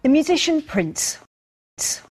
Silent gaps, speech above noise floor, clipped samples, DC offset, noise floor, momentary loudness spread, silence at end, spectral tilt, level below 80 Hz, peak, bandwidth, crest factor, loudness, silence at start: 1.27-1.77 s; over 70 dB; under 0.1%; under 0.1%; under -90 dBFS; 8 LU; 0.15 s; -3 dB/octave; -52 dBFS; -6 dBFS; 13.5 kHz; 16 dB; -21 LUFS; 0.05 s